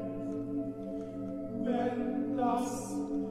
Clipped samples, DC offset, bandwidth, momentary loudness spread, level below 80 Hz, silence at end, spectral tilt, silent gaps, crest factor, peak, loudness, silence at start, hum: under 0.1%; under 0.1%; 13.5 kHz; 8 LU; -58 dBFS; 0 s; -6.5 dB/octave; none; 14 dB; -20 dBFS; -35 LUFS; 0 s; none